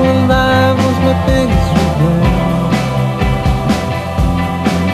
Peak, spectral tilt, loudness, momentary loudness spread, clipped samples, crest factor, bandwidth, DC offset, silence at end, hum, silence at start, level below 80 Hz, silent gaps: 0 dBFS; -6.5 dB/octave; -13 LUFS; 5 LU; under 0.1%; 12 dB; 14 kHz; under 0.1%; 0 s; none; 0 s; -22 dBFS; none